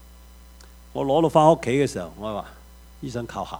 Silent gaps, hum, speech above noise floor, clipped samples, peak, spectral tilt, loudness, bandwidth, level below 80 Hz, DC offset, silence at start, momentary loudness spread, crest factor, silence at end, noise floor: none; none; 25 dB; under 0.1%; -4 dBFS; -6.5 dB/octave; -22 LUFS; over 20 kHz; -48 dBFS; under 0.1%; 0.95 s; 18 LU; 20 dB; 0 s; -47 dBFS